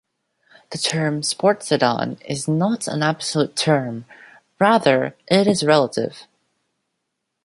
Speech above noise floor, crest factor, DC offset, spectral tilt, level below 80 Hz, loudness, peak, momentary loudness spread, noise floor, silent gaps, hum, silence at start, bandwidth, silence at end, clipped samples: 58 dB; 20 dB; under 0.1%; -4.5 dB/octave; -64 dBFS; -19 LUFS; -2 dBFS; 10 LU; -77 dBFS; none; none; 0.7 s; 11.5 kHz; 1.2 s; under 0.1%